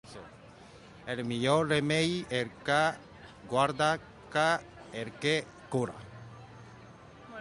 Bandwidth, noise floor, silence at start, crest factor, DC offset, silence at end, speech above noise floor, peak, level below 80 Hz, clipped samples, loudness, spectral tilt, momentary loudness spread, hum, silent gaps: 11.5 kHz; -53 dBFS; 0.05 s; 20 dB; under 0.1%; 0 s; 23 dB; -12 dBFS; -62 dBFS; under 0.1%; -30 LUFS; -4.5 dB/octave; 23 LU; none; none